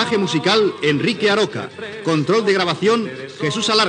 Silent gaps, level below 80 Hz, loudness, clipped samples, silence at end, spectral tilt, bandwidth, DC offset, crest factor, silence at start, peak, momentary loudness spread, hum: none; -68 dBFS; -18 LUFS; under 0.1%; 0 s; -4.5 dB/octave; 10 kHz; under 0.1%; 16 dB; 0 s; -2 dBFS; 9 LU; none